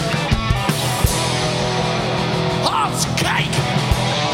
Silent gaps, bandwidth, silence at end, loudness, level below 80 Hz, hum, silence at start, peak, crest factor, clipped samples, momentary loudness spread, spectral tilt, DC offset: none; 17 kHz; 0 s; -18 LUFS; -30 dBFS; none; 0 s; -4 dBFS; 16 dB; under 0.1%; 2 LU; -4 dB/octave; under 0.1%